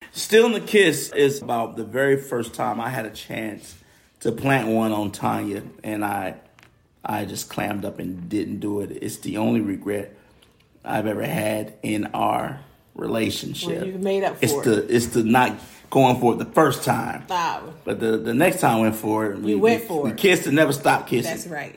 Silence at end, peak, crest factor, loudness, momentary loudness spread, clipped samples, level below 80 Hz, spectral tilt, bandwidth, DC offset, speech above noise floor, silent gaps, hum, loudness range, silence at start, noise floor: 0.05 s; -4 dBFS; 18 dB; -22 LUFS; 12 LU; under 0.1%; -58 dBFS; -5 dB/octave; 16.5 kHz; under 0.1%; 34 dB; none; none; 7 LU; 0 s; -56 dBFS